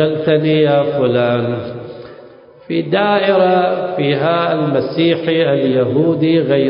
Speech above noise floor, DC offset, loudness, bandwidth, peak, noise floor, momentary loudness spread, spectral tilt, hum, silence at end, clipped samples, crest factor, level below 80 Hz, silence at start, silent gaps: 26 dB; under 0.1%; -14 LUFS; 5.4 kHz; -2 dBFS; -40 dBFS; 9 LU; -12 dB/octave; none; 0 s; under 0.1%; 12 dB; -56 dBFS; 0 s; none